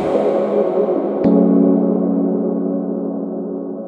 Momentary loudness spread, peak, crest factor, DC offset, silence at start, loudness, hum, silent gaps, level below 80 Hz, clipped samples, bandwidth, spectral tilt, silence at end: 11 LU; 0 dBFS; 16 dB; under 0.1%; 0 s; -17 LUFS; none; none; -56 dBFS; under 0.1%; 4.7 kHz; -10.5 dB/octave; 0 s